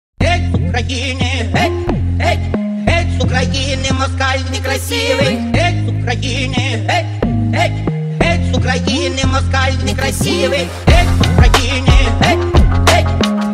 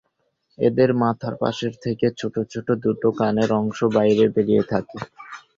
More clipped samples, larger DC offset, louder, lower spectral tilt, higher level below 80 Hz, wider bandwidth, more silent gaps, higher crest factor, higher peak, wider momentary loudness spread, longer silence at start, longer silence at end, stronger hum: neither; neither; first, -14 LUFS vs -21 LUFS; second, -5 dB/octave vs -7.5 dB/octave; first, -20 dBFS vs -56 dBFS; first, 15 kHz vs 7.6 kHz; neither; about the same, 14 dB vs 16 dB; first, 0 dBFS vs -4 dBFS; second, 6 LU vs 9 LU; second, 0.2 s vs 0.6 s; second, 0 s vs 0.2 s; neither